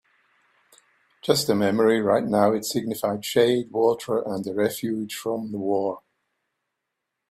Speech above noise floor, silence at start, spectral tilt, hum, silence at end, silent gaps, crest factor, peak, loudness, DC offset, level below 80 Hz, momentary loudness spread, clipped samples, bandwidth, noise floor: 59 dB; 1.25 s; -5 dB/octave; none; 1.35 s; none; 22 dB; -4 dBFS; -23 LUFS; under 0.1%; -66 dBFS; 9 LU; under 0.1%; 16 kHz; -82 dBFS